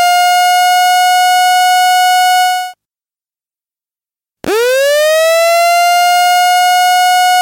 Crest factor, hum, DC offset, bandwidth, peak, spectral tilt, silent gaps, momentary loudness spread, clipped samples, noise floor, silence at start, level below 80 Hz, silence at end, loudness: 6 dB; none; under 0.1%; 17 kHz; -4 dBFS; 1 dB/octave; none; 4 LU; under 0.1%; under -90 dBFS; 0 s; -62 dBFS; 0 s; -9 LUFS